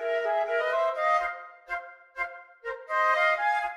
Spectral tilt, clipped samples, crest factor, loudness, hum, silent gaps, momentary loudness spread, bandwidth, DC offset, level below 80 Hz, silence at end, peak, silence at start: -1 dB/octave; under 0.1%; 16 dB; -27 LUFS; none; none; 15 LU; 12 kHz; under 0.1%; -66 dBFS; 0 s; -12 dBFS; 0 s